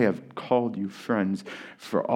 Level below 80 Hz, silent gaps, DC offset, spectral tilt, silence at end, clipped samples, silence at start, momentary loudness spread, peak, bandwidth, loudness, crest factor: -78 dBFS; none; under 0.1%; -7 dB/octave; 0 s; under 0.1%; 0 s; 11 LU; -8 dBFS; 15 kHz; -28 LUFS; 18 dB